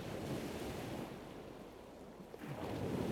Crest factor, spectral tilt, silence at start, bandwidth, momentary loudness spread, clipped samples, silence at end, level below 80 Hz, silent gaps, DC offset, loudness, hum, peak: 18 dB; -6 dB/octave; 0 s; 20 kHz; 12 LU; under 0.1%; 0 s; -62 dBFS; none; under 0.1%; -46 LUFS; none; -26 dBFS